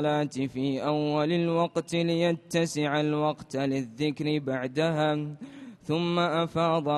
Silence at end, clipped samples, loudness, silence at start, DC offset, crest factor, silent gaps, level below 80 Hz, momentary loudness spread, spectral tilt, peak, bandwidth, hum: 0 s; under 0.1%; -28 LUFS; 0 s; under 0.1%; 16 dB; none; -66 dBFS; 5 LU; -6 dB/octave; -12 dBFS; 12.5 kHz; none